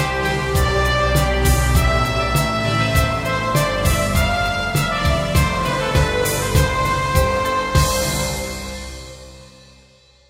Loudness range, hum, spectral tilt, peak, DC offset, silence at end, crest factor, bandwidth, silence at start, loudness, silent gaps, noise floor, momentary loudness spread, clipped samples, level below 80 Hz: 2 LU; none; -4.5 dB/octave; -4 dBFS; under 0.1%; 0.85 s; 16 dB; 16.5 kHz; 0 s; -18 LUFS; none; -51 dBFS; 6 LU; under 0.1%; -24 dBFS